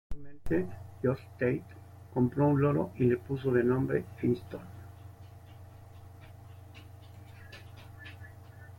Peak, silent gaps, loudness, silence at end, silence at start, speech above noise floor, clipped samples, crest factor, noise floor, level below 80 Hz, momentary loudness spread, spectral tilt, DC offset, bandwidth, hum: -12 dBFS; none; -31 LUFS; 0.05 s; 0.1 s; 21 dB; under 0.1%; 20 dB; -50 dBFS; -54 dBFS; 24 LU; -9.5 dB/octave; under 0.1%; 16.5 kHz; none